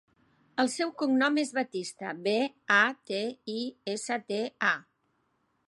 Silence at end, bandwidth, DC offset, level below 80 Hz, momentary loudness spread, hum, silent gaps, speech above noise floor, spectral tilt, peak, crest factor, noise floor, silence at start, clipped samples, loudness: 0.85 s; 11.5 kHz; under 0.1%; -84 dBFS; 11 LU; none; none; 45 dB; -3 dB/octave; -8 dBFS; 22 dB; -74 dBFS; 0.55 s; under 0.1%; -29 LUFS